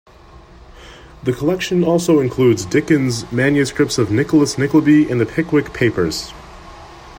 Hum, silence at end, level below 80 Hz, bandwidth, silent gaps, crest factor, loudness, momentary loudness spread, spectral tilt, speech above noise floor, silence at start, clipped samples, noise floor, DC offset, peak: none; 0 s; -44 dBFS; 16.5 kHz; none; 16 dB; -16 LUFS; 7 LU; -6 dB/octave; 27 dB; 0.75 s; under 0.1%; -42 dBFS; under 0.1%; -2 dBFS